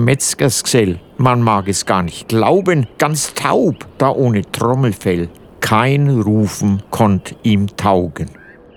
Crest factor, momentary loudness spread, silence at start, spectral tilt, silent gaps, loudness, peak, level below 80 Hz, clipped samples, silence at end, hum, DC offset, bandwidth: 14 dB; 5 LU; 0 s; -5.5 dB/octave; none; -15 LUFS; 0 dBFS; -44 dBFS; under 0.1%; 0.45 s; none; under 0.1%; 18.5 kHz